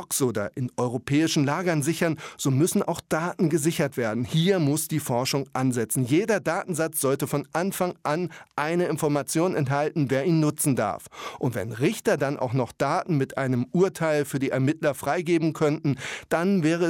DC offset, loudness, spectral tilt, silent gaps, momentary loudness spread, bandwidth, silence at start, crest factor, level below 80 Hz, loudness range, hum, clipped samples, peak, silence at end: under 0.1%; -25 LUFS; -5.5 dB/octave; none; 5 LU; 17.5 kHz; 0 s; 14 dB; -64 dBFS; 1 LU; none; under 0.1%; -10 dBFS; 0 s